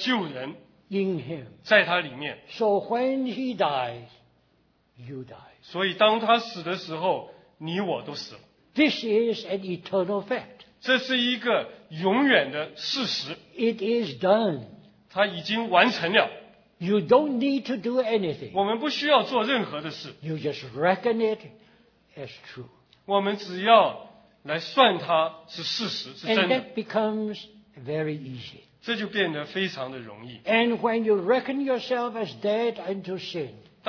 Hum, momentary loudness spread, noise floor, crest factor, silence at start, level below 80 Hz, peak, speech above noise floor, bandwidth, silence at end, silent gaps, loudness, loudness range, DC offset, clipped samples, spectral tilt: none; 17 LU; -66 dBFS; 22 dB; 0 s; -72 dBFS; -4 dBFS; 40 dB; 5.4 kHz; 0.3 s; none; -25 LUFS; 5 LU; under 0.1%; under 0.1%; -5.5 dB/octave